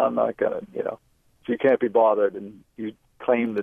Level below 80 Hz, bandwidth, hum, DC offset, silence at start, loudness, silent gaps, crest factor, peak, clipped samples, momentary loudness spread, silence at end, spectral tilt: -66 dBFS; 4.4 kHz; none; under 0.1%; 0 s; -23 LUFS; none; 16 dB; -8 dBFS; under 0.1%; 19 LU; 0 s; -8 dB/octave